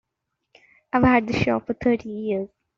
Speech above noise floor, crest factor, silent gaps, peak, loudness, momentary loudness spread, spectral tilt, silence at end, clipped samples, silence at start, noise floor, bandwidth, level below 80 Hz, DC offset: 58 dB; 20 dB; none; -4 dBFS; -22 LUFS; 9 LU; -5.5 dB/octave; 0.3 s; under 0.1%; 0.95 s; -80 dBFS; 7.2 kHz; -48 dBFS; under 0.1%